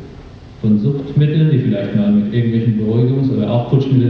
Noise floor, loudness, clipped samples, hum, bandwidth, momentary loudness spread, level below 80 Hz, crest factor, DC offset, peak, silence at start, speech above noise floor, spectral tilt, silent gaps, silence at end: -35 dBFS; -15 LUFS; under 0.1%; none; 5.4 kHz; 3 LU; -44 dBFS; 14 dB; under 0.1%; 0 dBFS; 0 s; 21 dB; -10.5 dB/octave; none; 0 s